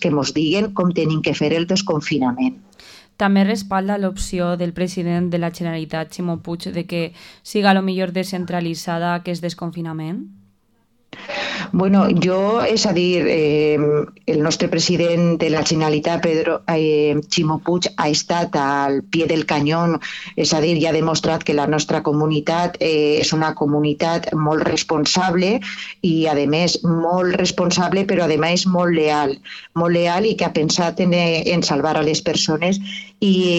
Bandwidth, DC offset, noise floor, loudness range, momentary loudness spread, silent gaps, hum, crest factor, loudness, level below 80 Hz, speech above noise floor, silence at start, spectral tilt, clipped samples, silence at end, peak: 13 kHz; under 0.1%; -60 dBFS; 5 LU; 8 LU; none; none; 14 dB; -18 LUFS; -48 dBFS; 42 dB; 0 s; -5 dB/octave; under 0.1%; 0 s; -4 dBFS